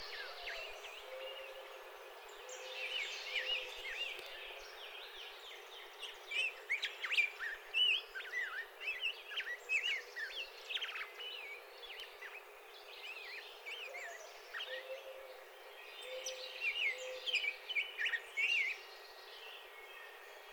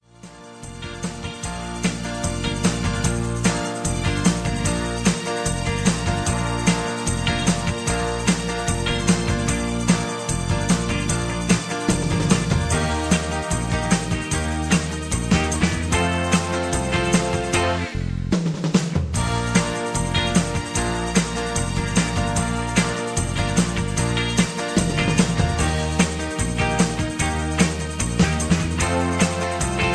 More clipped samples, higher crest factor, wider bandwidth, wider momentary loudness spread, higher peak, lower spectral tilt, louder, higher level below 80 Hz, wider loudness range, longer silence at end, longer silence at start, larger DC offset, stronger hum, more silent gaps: neither; about the same, 22 dB vs 18 dB; first, over 20 kHz vs 11 kHz; first, 17 LU vs 5 LU; second, -22 dBFS vs -2 dBFS; second, 2 dB/octave vs -4.5 dB/octave; second, -40 LUFS vs -22 LUFS; second, -78 dBFS vs -32 dBFS; first, 11 LU vs 1 LU; about the same, 0 s vs 0 s; second, 0 s vs 0.25 s; neither; neither; neither